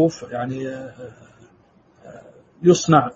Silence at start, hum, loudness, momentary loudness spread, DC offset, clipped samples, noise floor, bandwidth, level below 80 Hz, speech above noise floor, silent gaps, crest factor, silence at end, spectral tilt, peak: 0 s; none; -20 LUFS; 25 LU; under 0.1%; under 0.1%; -55 dBFS; 7.8 kHz; -58 dBFS; 35 dB; none; 20 dB; 0.05 s; -6 dB/octave; 0 dBFS